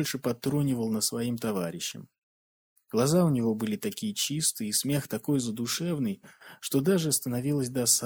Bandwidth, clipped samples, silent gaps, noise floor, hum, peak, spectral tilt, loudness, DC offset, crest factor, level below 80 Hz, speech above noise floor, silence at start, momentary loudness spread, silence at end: over 20 kHz; under 0.1%; 2.18-2.76 s; under -90 dBFS; none; -8 dBFS; -4.5 dB/octave; -28 LUFS; under 0.1%; 20 dB; -66 dBFS; over 62 dB; 0 s; 8 LU; 0 s